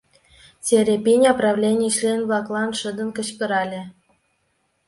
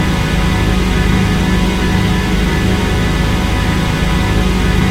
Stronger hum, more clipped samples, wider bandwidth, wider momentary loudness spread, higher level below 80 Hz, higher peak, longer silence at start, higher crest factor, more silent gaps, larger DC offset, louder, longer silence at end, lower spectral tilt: neither; neither; second, 11.5 kHz vs 16 kHz; first, 12 LU vs 1 LU; second, -62 dBFS vs -18 dBFS; about the same, -2 dBFS vs 0 dBFS; first, 0.65 s vs 0 s; first, 18 dB vs 12 dB; neither; neither; second, -20 LUFS vs -14 LUFS; first, 0.95 s vs 0 s; second, -4 dB/octave vs -5.5 dB/octave